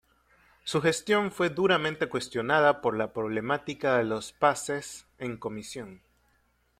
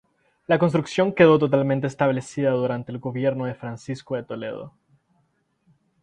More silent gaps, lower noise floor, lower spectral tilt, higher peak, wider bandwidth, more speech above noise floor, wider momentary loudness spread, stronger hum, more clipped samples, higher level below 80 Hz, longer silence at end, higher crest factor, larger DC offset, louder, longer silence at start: neither; about the same, -69 dBFS vs -68 dBFS; second, -4.5 dB/octave vs -7 dB/octave; second, -8 dBFS vs -2 dBFS; first, 15 kHz vs 9.8 kHz; second, 41 dB vs 47 dB; second, 14 LU vs 17 LU; neither; neither; about the same, -64 dBFS vs -62 dBFS; second, 0.85 s vs 1.35 s; about the same, 20 dB vs 20 dB; neither; second, -28 LUFS vs -22 LUFS; first, 0.65 s vs 0.5 s